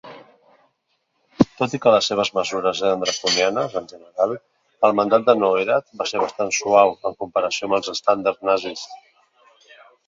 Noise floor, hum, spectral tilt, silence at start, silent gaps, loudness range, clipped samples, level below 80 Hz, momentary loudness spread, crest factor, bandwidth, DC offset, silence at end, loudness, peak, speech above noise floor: -70 dBFS; none; -3.5 dB/octave; 0.05 s; none; 2 LU; under 0.1%; -60 dBFS; 10 LU; 20 dB; 7.8 kHz; under 0.1%; 1.1 s; -20 LUFS; 0 dBFS; 51 dB